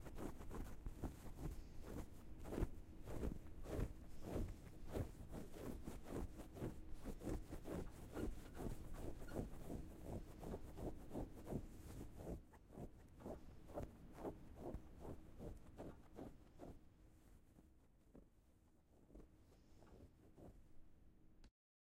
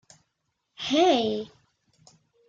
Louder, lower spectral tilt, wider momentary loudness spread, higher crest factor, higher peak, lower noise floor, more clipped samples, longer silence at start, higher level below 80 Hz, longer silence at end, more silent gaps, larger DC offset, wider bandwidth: second, -54 LUFS vs -24 LUFS; first, -7 dB/octave vs -4 dB/octave; about the same, 15 LU vs 15 LU; about the same, 22 dB vs 20 dB; second, -28 dBFS vs -10 dBFS; second, -72 dBFS vs -78 dBFS; neither; second, 0 s vs 0.8 s; first, -56 dBFS vs -68 dBFS; second, 0.5 s vs 1 s; neither; neither; first, 16 kHz vs 7.8 kHz